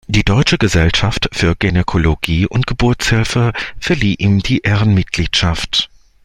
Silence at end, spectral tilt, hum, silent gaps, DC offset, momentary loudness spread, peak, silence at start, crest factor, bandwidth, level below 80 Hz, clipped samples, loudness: 0.4 s; -5 dB/octave; none; none; under 0.1%; 4 LU; 0 dBFS; 0.1 s; 14 dB; 13 kHz; -28 dBFS; under 0.1%; -14 LUFS